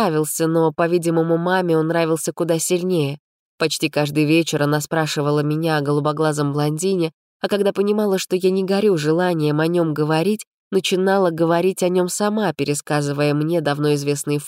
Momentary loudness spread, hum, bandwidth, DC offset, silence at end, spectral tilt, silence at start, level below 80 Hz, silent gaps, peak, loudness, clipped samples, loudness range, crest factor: 4 LU; none; 16 kHz; under 0.1%; 0 s; -5.5 dB/octave; 0 s; -68 dBFS; 3.19-3.58 s, 7.14-7.40 s, 10.47-10.71 s; -6 dBFS; -19 LUFS; under 0.1%; 1 LU; 12 dB